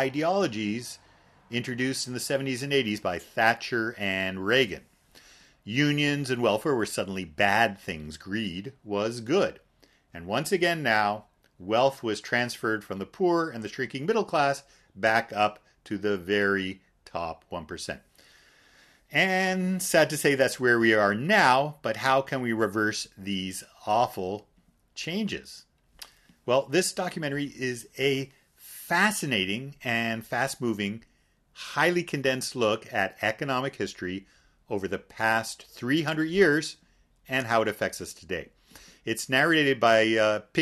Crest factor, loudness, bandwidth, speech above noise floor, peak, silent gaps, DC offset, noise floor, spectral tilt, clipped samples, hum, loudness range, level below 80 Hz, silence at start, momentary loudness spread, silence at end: 22 dB; -27 LUFS; 13.5 kHz; 36 dB; -4 dBFS; none; under 0.1%; -63 dBFS; -4 dB/octave; under 0.1%; none; 6 LU; -62 dBFS; 0 s; 15 LU; 0 s